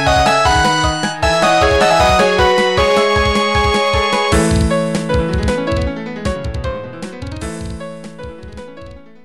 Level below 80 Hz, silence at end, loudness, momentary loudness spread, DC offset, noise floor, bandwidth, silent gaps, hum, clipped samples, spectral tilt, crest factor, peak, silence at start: -26 dBFS; 0.25 s; -14 LUFS; 18 LU; 0.8%; -36 dBFS; 15.5 kHz; none; none; under 0.1%; -4.5 dB/octave; 10 dB; -4 dBFS; 0 s